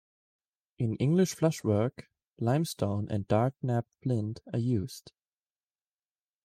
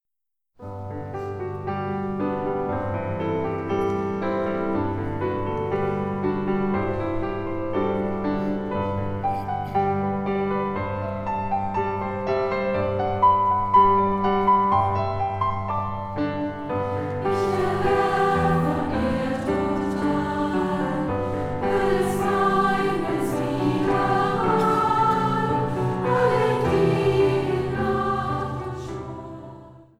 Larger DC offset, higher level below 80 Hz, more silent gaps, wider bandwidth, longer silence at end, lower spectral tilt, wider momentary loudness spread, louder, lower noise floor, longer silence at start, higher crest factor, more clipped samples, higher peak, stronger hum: neither; second, -66 dBFS vs -44 dBFS; first, 2.27-2.36 s vs none; about the same, 15.5 kHz vs 14.5 kHz; first, 1.35 s vs 0.15 s; about the same, -7 dB/octave vs -7.5 dB/octave; about the same, 8 LU vs 8 LU; second, -30 LUFS vs -24 LUFS; first, under -90 dBFS vs -86 dBFS; first, 0.8 s vs 0.6 s; about the same, 20 dB vs 16 dB; neither; second, -12 dBFS vs -6 dBFS; neither